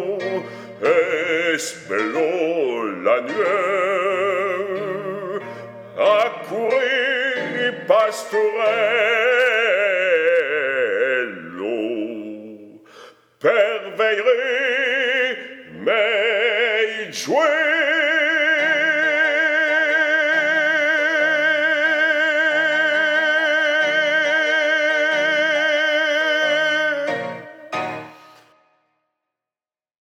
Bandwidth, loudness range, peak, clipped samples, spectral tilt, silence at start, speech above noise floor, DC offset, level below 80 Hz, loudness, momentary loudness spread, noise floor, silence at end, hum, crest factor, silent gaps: 14.5 kHz; 5 LU; -4 dBFS; under 0.1%; -2.5 dB/octave; 0 s; over 70 dB; under 0.1%; -82 dBFS; -18 LUFS; 10 LU; under -90 dBFS; 1.95 s; none; 16 dB; none